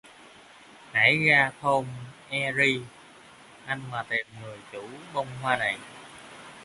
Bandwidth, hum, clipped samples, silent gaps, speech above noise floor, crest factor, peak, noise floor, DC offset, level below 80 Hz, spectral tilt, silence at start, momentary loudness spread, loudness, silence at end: 11.5 kHz; none; under 0.1%; none; 24 dB; 22 dB; -6 dBFS; -51 dBFS; under 0.1%; -66 dBFS; -4.5 dB/octave; 0.05 s; 25 LU; -25 LUFS; 0 s